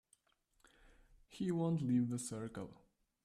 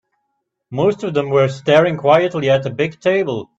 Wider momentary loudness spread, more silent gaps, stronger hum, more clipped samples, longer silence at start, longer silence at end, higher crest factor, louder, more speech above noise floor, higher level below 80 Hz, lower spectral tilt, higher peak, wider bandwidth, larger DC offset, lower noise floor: first, 16 LU vs 6 LU; neither; neither; neither; first, 1.3 s vs 0.7 s; first, 0.5 s vs 0.15 s; about the same, 16 dB vs 16 dB; second, -39 LUFS vs -16 LUFS; second, 41 dB vs 57 dB; second, -70 dBFS vs -56 dBFS; about the same, -7 dB/octave vs -6.5 dB/octave; second, -26 dBFS vs 0 dBFS; first, 14 kHz vs 8 kHz; neither; first, -79 dBFS vs -73 dBFS